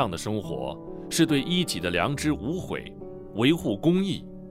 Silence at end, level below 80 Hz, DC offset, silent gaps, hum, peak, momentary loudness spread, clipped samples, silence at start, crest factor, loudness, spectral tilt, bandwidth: 0 s; -50 dBFS; under 0.1%; none; none; -8 dBFS; 12 LU; under 0.1%; 0 s; 18 dB; -26 LUFS; -5 dB/octave; 16 kHz